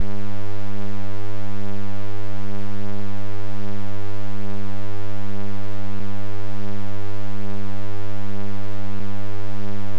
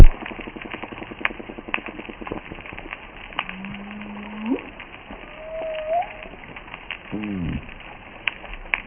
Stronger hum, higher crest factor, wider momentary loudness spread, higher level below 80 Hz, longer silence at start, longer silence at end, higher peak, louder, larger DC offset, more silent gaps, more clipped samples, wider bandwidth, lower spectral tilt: neither; about the same, 22 dB vs 22 dB; second, 1 LU vs 11 LU; second, -62 dBFS vs -26 dBFS; about the same, 0 s vs 0 s; about the same, 0 s vs 0 s; second, -8 dBFS vs 0 dBFS; second, -33 LUFS vs -30 LUFS; first, 30% vs under 0.1%; neither; second, under 0.1% vs 0.3%; first, 10.5 kHz vs 3.4 kHz; first, -7.5 dB/octave vs -3 dB/octave